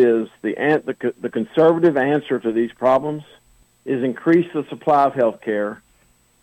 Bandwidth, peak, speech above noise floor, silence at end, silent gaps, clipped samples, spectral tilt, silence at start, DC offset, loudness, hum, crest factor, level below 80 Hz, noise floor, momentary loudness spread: 8.4 kHz; -6 dBFS; 39 dB; 0.7 s; none; under 0.1%; -8 dB/octave; 0 s; under 0.1%; -19 LUFS; none; 14 dB; -62 dBFS; -58 dBFS; 10 LU